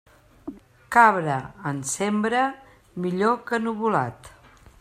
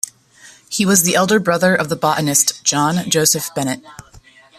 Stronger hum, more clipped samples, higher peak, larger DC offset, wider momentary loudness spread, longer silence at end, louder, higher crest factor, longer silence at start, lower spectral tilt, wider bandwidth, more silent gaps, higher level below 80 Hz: neither; neither; about the same, -2 dBFS vs 0 dBFS; neither; first, 24 LU vs 10 LU; about the same, 0.5 s vs 0.55 s; second, -23 LUFS vs -15 LUFS; about the same, 22 dB vs 18 dB; about the same, 0.45 s vs 0.45 s; first, -5 dB/octave vs -3 dB/octave; about the same, 15 kHz vs 14.5 kHz; neither; about the same, -60 dBFS vs -56 dBFS